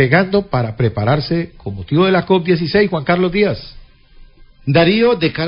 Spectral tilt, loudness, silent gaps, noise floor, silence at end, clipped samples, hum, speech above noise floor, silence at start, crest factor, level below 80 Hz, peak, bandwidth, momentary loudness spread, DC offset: -11 dB/octave; -15 LUFS; none; -42 dBFS; 0 s; under 0.1%; none; 28 dB; 0 s; 16 dB; -40 dBFS; 0 dBFS; 5.4 kHz; 8 LU; under 0.1%